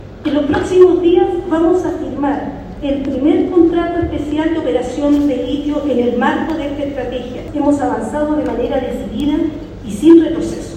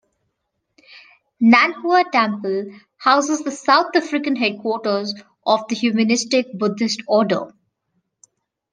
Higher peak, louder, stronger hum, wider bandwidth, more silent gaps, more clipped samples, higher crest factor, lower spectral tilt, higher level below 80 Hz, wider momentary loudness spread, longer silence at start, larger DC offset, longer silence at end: about the same, 0 dBFS vs 0 dBFS; first, -15 LUFS vs -18 LUFS; neither; about the same, 9.8 kHz vs 10 kHz; neither; first, 0.2% vs under 0.1%; about the same, 14 dB vs 18 dB; first, -6.5 dB/octave vs -4 dB/octave; first, -36 dBFS vs -72 dBFS; about the same, 12 LU vs 10 LU; second, 0 s vs 0.95 s; neither; second, 0 s vs 1.25 s